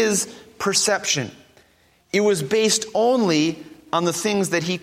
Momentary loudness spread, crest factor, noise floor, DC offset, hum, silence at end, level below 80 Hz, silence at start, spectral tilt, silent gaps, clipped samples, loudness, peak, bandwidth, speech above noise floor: 8 LU; 16 dB; -58 dBFS; under 0.1%; none; 0.05 s; -64 dBFS; 0 s; -3 dB/octave; none; under 0.1%; -20 LUFS; -4 dBFS; 16 kHz; 38 dB